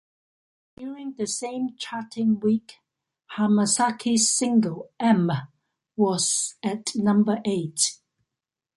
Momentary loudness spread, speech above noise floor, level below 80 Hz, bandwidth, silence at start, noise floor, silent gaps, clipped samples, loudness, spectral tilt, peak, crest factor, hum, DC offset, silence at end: 13 LU; 64 dB; -68 dBFS; 11.5 kHz; 0.8 s; -88 dBFS; none; under 0.1%; -24 LUFS; -4 dB/octave; -6 dBFS; 18 dB; none; under 0.1%; 0.85 s